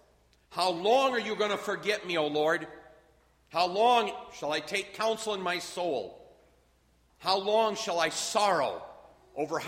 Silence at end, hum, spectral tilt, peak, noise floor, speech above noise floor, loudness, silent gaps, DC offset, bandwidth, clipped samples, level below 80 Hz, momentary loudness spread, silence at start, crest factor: 0 s; none; -2.5 dB/octave; -10 dBFS; -66 dBFS; 37 dB; -29 LUFS; none; under 0.1%; 16 kHz; under 0.1%; -70 dBFS; 11 LU; 0.5 s; 20 dB